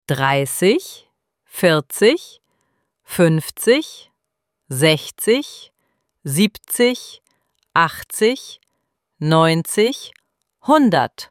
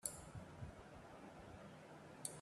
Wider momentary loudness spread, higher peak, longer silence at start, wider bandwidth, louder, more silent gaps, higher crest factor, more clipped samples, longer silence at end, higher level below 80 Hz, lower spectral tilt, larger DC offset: first, 16 LU vs 8 LU; first, -2 dBFS vs -22 dBFS; about the same, 0.1 s vs 0 s; first, 17 kHz vs 14 kHz; first, -17 LUFS vs -55 LUFS; neither; second, 18 dB vs 32 dB; neither; about the same, 0.05 s vs 0 s; first, -60 dBFS vs -70 dBFS; about the same, -4.5 dB/octave vs -3.5 dB/octave; neither